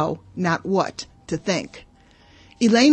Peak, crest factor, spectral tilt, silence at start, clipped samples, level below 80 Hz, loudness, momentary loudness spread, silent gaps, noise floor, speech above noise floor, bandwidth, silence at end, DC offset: -4 dBFS; 18 dB; -5 dB/octave; 0 s; under 0.1%; -56 dBFS; -23 LUFS; 12 LU; none; -52 dBFS; 32 dB; 8.8 kHz; 0 s; under 0.1%